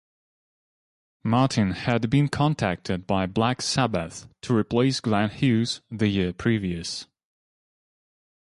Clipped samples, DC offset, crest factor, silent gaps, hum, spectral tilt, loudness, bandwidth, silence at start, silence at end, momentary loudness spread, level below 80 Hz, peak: under 0.1%; under 0.1%; 18 dB; none; none; -5.5 dB/octave; -24 LUFS; 11.5 kHz; 1.25 s; 1.5 s; 8 LU; -50 dBFS; -8 dBFS